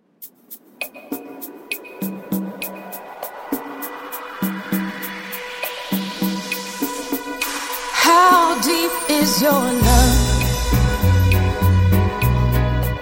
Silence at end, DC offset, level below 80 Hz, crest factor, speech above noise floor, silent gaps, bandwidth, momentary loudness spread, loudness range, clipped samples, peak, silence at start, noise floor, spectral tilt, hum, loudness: 0 s; under 0.1%; -26 dBFS; 18 dB; 28 dB; none; 17 kHz; 17 LU; 13 LU; under 0.1%; 0 dBFS; 0.2 s; -43 dBFS; -4.5 dB/octave; none; -19 LUFS